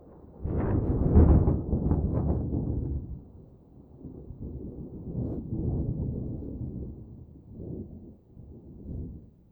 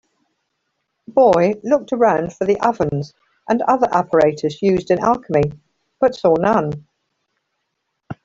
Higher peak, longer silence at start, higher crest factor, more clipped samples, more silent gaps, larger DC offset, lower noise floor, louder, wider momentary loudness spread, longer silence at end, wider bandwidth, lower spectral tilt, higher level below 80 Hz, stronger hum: second, -6 dBFS vs -2 dBFS; second, 0 s vs 1.1 s; first, 22 dB vs 16 dB; neither; neither; neither; second, -52 dBFS vs -74 dBFS; second, -29 LUFS vs -17 LUFS; first, 24 LU vs 8 LU; first, 0.25 s vs 0.1 s; second, 2.3 kHz vs 7.8 kHz; first, -14 dB/octave vs -7 dB/octave; first, -34 dBFS vs -52 dBFS; neither